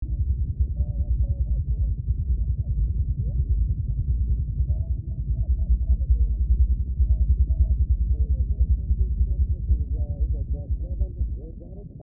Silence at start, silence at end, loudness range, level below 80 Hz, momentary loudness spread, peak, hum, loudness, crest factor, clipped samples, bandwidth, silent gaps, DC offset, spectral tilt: 0 s; 0 s; 3 LU; -24 dBFS; 6 LU; -10 dBFS; none; -26 LUFS; 12 dB; under 0.1%; 0.8 kHz; none; 0.3%; -18.5 dB/octave